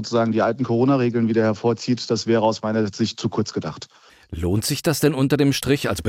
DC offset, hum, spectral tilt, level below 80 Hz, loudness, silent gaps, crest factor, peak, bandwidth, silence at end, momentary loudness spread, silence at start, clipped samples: under 0.1%; none; -5.5 dB/octave; -48 dBFS; -21 LUFS; none; 16 dB; -4 dBFS; 16.5 kHz; 0 s; 9 LU; 0 s; under 0.1%